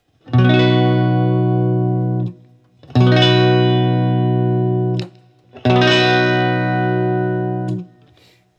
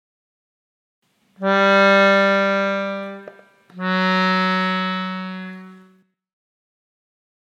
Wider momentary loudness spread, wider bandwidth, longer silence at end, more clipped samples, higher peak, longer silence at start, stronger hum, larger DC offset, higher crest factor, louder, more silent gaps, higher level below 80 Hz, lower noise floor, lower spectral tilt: second, 10 LU vs 20 LU; second, 7 kHz vs 8 kHz; second, 0.75 s vs 1.75 s; neither; about the same, 0 dBFS vs -2 dBFS; second, 0.25 s vs 1.4 s; neither; neither; about the same, 16 dB vs 18 dB; about the same, -16 LUFS vs -18 LUFS; neither; first, -56 dBFS vs -78 dBFS; second, -52 dBFS vs -56 dBFS; first, -7.5 dB/octave vs -6 dB/octave